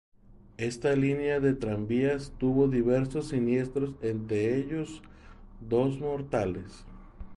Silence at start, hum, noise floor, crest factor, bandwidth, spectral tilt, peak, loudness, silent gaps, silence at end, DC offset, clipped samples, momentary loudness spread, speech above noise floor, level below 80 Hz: 0.3 s; none; -48 dBFS; 16 dB; 11.5 kHz; -7.5 dB/octave; -12 dBFS; -29 LUFS; none; 0 s; under 0.1%; under 0.1%; 10 LU; 20 dB; -50 dBFS